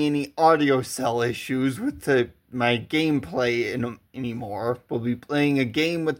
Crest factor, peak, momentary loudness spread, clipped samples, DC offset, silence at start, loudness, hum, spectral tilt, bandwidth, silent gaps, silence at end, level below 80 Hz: 18 dB; -6 dBFS; 10 LU; under 0.1%; under 0.1%; 0 s; -24 LUFS; none; -5.5 dB/octave; 16.5 kHz; none; 0 s; -60 dBFS